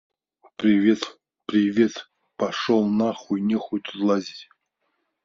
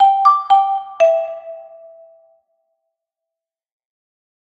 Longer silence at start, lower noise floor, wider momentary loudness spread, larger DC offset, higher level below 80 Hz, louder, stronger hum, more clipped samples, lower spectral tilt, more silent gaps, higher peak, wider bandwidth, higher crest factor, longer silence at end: first, 0.6 s vs 0 s; second, -75 dBFS vs -86 dBFS; second, 18 LU vs 22 LU; neither; first, -68 dBFS vs -74 dBFS; second, -23 LUFS vs -15 LUFS; neither; neither; first, -5 dB/octave vs -1.5 dB/octave; neither; second, -6 dBFS vs 0 dBFS; about the same, 7.4 kHz vs 7.8 kHz; about the same, 18 dB vs 18 dB; second, 0.8 s vs 2.9 s